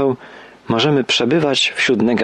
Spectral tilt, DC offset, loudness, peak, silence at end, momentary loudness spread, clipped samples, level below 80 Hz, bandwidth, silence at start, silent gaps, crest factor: -4.5 dB/octave; under 0.1%; -16 LUFS; -6 dBFS; 0 s; 6 LU; under 0.1%; -56 dBFS; 10.5 kHz; 0 s; none; 12 dB